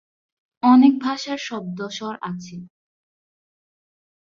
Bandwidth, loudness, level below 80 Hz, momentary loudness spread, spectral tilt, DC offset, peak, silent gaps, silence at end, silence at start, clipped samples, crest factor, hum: 7.4 kHz; -20 LUFS; -68 dBFS; 20 LU; -5.5 dB/octave; under 0.1%; -4 dBFS; none; 1.55 s; 0.65 s; under 0.1%; 18 dB; none